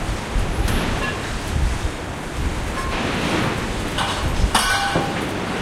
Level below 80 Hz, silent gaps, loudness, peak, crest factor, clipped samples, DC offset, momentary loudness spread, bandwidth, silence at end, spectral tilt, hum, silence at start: -26 dBFS; none; -22 LUFS; -2 dBFS; 20 dB; under 0.1%; under 0.1%; 7 LU; 16 kHz; 0 s; -4 dB/octave; none; 0 s